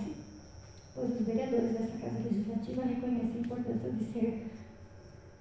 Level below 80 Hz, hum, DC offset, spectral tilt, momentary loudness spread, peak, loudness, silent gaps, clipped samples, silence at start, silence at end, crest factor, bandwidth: -58 dBFS; none; under 0.1%; -8 dB/octave; 20 LU; -18 dBFS; -35 LUFS; none; under 0.1%; 0 s; 0 s; 16 dB; 8 kHz